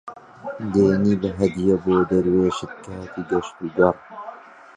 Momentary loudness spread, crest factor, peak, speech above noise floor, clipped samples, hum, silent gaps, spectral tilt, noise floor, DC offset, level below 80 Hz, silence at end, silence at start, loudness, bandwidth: 18 LU; 20 dB; -2 dBFS; 20 dB; under 0.1%; none; none; -7.5 dB/octave; -40 dBFS; under 0.1%; -48 dBFS; 0.35 s; 0.05 s; -21 LUFS; 9.6 kHz